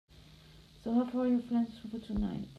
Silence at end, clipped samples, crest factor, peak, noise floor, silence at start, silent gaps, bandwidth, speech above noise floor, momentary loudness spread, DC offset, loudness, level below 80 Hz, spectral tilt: 0 s; under 0.1%; 14 dB; -20 dBFS; -57 dBFS; 0.15 s; none; 6.6 kHz; 24 dB; 10 LU; under 0.1%; -34 LUFS; -52 dBFS; -8 dB/octave